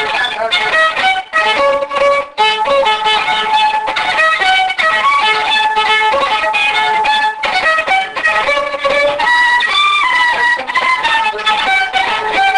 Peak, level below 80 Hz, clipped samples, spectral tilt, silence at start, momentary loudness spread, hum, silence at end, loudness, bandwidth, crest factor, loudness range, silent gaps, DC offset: -2 dBFS; -48 dBFS; under 0.1%; -1 dB/octave; 0 s; 3 LU; none; 0 s; -11 LUFS; 10 kHz; 10 dB; 1 LU; none; under 0.1%